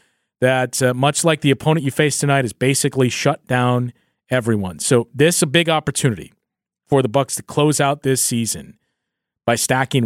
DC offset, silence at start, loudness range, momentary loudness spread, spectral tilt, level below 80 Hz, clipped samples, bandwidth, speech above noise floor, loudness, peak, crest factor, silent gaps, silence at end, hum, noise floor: under 0.1%; 0.4 s; 2 LU; 6 LU; -4.5 dB/octave; -54 dBFS; under 0.1%; 16.5 kHz; 63 dB; -18 LUFS; -2 dBFS; 16 dB; none; 0 s; none; -80 dBFS